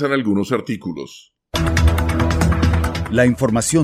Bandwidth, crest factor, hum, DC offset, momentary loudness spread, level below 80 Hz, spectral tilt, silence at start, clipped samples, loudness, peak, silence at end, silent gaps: 15.5 kHz; 14 dB; none; under 0.1%; 10 LU; -24 dBFS; -5.5 dB/octave; 0 s; under 0.1%; -18 LUFS; -2 dBFS; 0 s; none